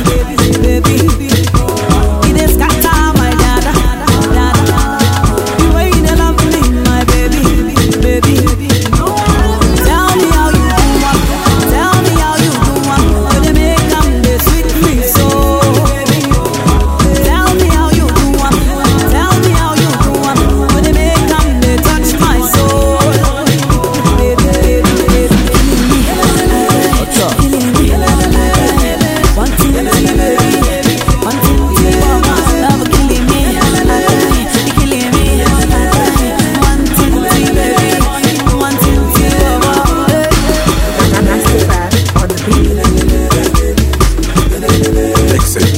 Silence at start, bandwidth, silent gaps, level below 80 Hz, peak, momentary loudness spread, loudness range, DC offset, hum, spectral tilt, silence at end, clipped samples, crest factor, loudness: 0 s; 16.5 kHz; none; -14 dBFS; 0 dBFS; 2 LU; 1 LU; under 0.1%; none; -5 dB/octave; 0 s; 0.4%; 8 dB; -10 LUFS